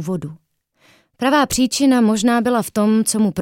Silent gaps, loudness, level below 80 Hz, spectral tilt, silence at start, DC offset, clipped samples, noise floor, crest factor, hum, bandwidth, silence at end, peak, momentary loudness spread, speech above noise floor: none; -17 LUFS; -50 dBFS; -4.5 dB/octave; 0 s; under 0.1%; under 0.1%; -56 dBFS; 14 dB; none; 17 kHz; 0 s; -4 dBFS; 10 LU; 40 dB